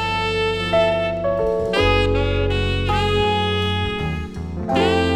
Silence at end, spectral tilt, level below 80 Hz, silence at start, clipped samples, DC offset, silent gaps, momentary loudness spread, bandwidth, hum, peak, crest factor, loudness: 0 s; -6 dB/octave; -30 dBFS; 0 s; under 0.1%; under 0.1%; none; 6 LU; 12 kHz; none; -4 dBFS; 16 dB; -20 LUFS